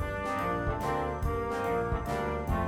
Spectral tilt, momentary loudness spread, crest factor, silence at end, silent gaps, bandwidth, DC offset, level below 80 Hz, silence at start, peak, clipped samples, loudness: -7 dB/octave; 2 LU; 14 dB; 0 s; none; 17.5 kHz; under 0.1%; -40 dBFS; 0 s; -18 dBFS; under 0.1%; -32 LUFS